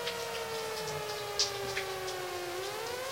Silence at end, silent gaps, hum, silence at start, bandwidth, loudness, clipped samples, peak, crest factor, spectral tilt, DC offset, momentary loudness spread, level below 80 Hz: 0 s; none; none; 0 s; 16 kHz; -35 LUFS; under 0.1%; -14 dBFS; 22 dB; -2 dB/octave; under 0.1%; 6 LU; -64 dBFS